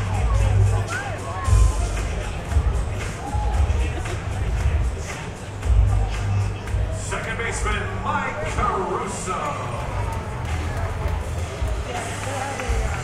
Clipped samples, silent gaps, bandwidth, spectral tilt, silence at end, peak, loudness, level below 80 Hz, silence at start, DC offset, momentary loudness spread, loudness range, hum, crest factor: under 0.1%; none; 12.5 kHz; -5.5 dB/octave; 0 s; -6 dBFS; -25 LUFS; -26 dBFS; 0 s; under 0.1%; 8 LU; 4 LU; none; 16 dB